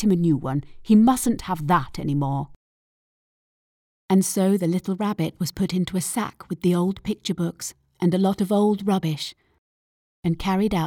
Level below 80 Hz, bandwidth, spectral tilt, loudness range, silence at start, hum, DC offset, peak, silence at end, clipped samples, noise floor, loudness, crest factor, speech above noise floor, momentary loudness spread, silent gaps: -48 dBFS; 18 kHz; -6 dB/octave; 2 LU; 0 s; none; under 0.1%; -6 dBFS; 0 s; under 0.1%; under -90 dBFS; -23 LUFS; 16 dB; over 68 dB; 10 LU; 2.56-4.09 s, 9.58-10.23 s